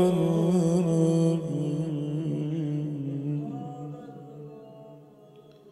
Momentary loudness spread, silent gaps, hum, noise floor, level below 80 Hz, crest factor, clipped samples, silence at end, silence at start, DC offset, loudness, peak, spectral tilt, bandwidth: 21 LU; none; none; -52 dBFS; -72 dBFS; 16 dB; under 0.1%; 0 s; 0 s; under 0.1%; -27 LUFS; -10 dBFS; -8.5 dB/octave; 12 kHz